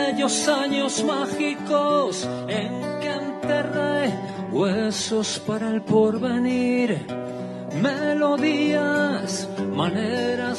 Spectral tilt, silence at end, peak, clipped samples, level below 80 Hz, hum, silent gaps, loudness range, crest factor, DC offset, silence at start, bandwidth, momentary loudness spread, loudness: -4.5 dB/octave; 0 s; -6 dBFS; under 0.1%; -64 dBFS; none; none; 2 LU; 16 dB; under 0.1%; 0 s; 12 kHz; 7 LU; -23 LUFS